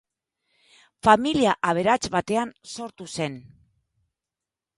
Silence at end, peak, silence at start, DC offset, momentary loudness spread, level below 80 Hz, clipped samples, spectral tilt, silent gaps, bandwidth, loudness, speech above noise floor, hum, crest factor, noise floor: 1.35 s; -2 dBFS; 1.05 s; under 0.1%; 17 LU; -56 dBFS; under 0.1%; -4.5 dB/octave; none; 11.5 kHz; -23 LUFS; 66 dB; none; 24 dB; -89 dBFS